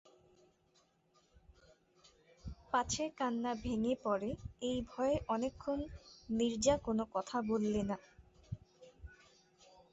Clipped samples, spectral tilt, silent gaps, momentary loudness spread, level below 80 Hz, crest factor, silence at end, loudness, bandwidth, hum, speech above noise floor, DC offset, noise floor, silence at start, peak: under 0.1%; -5 dB/octave; none; 19 LU; -58 dBFS; 20 dB; 0.8 s; -37 LUFS; 8 kHz; none; 37 dB; under 0.1%; -73 dBFS; 2.45 s; -18 dBFS